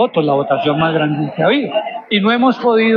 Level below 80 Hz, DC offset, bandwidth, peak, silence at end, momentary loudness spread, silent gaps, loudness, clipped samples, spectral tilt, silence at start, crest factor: -58 dBFS; under 0.1%; 6.4 kHz; -2 dBFS; 0 s; 5 LU; none; -15 LUFS; under 0.1%; -8.5 dB/octave; 0 s; 12 dB